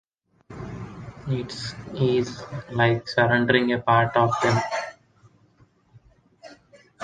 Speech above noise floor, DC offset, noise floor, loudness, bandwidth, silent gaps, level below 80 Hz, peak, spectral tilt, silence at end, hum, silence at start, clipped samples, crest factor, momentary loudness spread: 37 dB; under 0.1%; -59 dBFS; -23 LUFS; 9.6 kHz; none; -54 dBFS; -4 dBFS; -6 dB/octave; 0 s; none; 0.5 s; under 0.1%; 22 dB; 18 LU